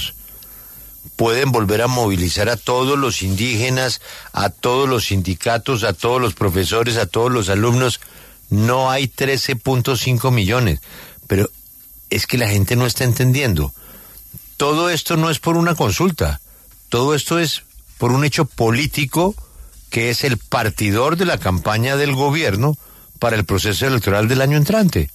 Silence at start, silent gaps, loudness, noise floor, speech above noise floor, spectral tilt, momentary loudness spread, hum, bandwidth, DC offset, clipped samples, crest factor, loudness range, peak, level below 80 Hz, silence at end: 0 s; none; -17 LUFS; -44 dBFS; 27 dB; -5 dB/octave; 10 LU; none; 14 kHz; under 0.1%; under 0.1%; 14 dB; 1 LU; -4 dBFS; -38 dBFS; 0.05 s